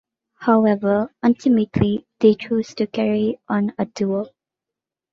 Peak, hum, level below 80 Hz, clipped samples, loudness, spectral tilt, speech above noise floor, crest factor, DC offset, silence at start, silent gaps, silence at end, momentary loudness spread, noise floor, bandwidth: -2 dBFS; none; -50 dBFS; under 0.1%; -20 LUFS; -7.5 dB/octave; 68 dB; 18 dB; under 0.1%; 0.4 s; none; 0.85 s; 8 LU; -87 dBFS; 7.2 kHz